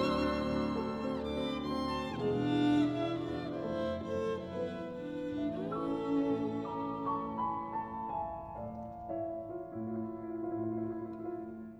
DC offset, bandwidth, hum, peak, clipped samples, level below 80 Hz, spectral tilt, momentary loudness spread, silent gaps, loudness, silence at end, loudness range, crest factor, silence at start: under 0.1%; 11 kHz; none; -20 dBFS; under 0.1%; -56 dBFS; -7.5 dB/octave; 9 LU; none; -36 LUFS; 0 s; 6 LU; 16 dB; 0 s